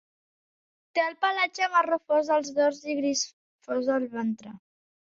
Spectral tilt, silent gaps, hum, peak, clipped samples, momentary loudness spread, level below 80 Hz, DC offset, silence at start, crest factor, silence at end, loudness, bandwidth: -2.5 dB/octave; 3.33-3.59 s; none; -10 dBFS; under 0.1%; 9 LU; -76 dBFS; under 0.1%; 0.95 s; 18 dB; 0.55 s; -27 LUFS; 7.8 kHz